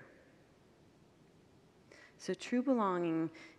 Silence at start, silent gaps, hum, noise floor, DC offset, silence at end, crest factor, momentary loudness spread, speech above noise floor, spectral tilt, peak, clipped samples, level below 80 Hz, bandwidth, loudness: 0 s; none; none; -65 dBFS; under 0.1%; 0.1 s; 18 dB; 14 LU; 30 dB; -6 dB/octave; -20 dBFS; under 0.1%; -80 dBFS; 11.5 kHz; -36 LUFS